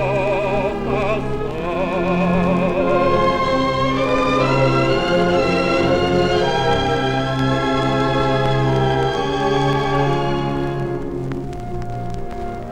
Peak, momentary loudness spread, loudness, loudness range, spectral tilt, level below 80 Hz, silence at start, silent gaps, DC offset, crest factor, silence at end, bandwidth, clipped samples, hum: -4 dBFS; 9 LU; -18 LUFS; 3 LU; -6.5 dB/octave; -34 dBFS; 0 s; none; under 0.1%; 14 dB; 0 s; 10.5 kHz; under 0.1%; none